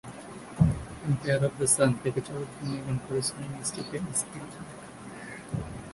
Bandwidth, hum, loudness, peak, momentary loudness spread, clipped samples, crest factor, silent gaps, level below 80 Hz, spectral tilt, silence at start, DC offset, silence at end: 11.5 kHz; none; -29 LUFS; -8 dBFS; 19 LU; under 0.1%; 22 dB; none; -48 dBFS; -5 dB/octave; 0.05 s; under 0.1%; 0 s